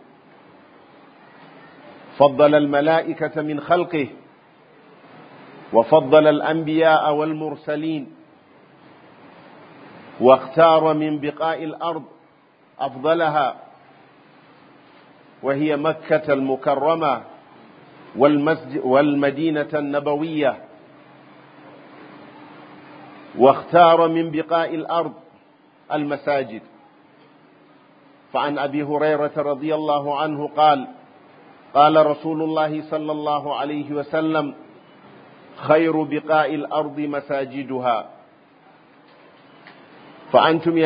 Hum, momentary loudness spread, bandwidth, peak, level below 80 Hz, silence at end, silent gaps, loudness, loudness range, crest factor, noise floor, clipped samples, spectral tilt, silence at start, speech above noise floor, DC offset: none; 13 LU; 5.2 kHz; 0 dBFS; -70 dBFS; 0 s; none; -19 LUFS; 7 LU; 22 dB; -55 dBFS; under 0.1%; -10.5 dB/octave; 1.85 s; 36 dB; under 0.1%